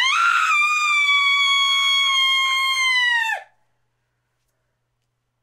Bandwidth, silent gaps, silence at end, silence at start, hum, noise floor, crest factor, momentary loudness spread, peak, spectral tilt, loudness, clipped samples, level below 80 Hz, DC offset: 16 kHz; none; 2 s; 0 s; none; -73 dBFS; 14 dB; 3 LU; -6 dBFS; 6.5 dB/octave; -16 LUFS; under 0.1%; -82 dBFS; under 0.1%